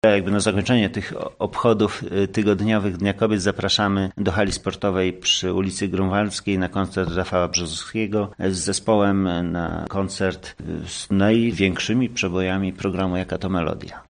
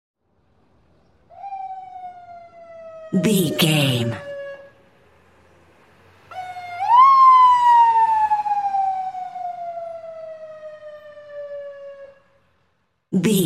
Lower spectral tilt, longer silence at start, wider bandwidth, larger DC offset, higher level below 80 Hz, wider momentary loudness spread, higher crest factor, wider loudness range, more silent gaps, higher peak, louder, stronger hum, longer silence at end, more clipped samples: about the same, -5 dB/octave vs -5 dB/octave; second, 0.05 s vs 1.35 s; second, 10 kHz vs 16 kHz; neither; first, -46 dBFS vs -66 dBFS; second, 7 LU vs 26 LU; about the same, 18 dB vs 18 dB; second, 2 LU vs 19 LU; neither; about the same, -2 dBFS vs -4 dBFS; second, -22 LUFS vs -16 LUFS; neither; about the same, 0.1 s vs 0 s; neither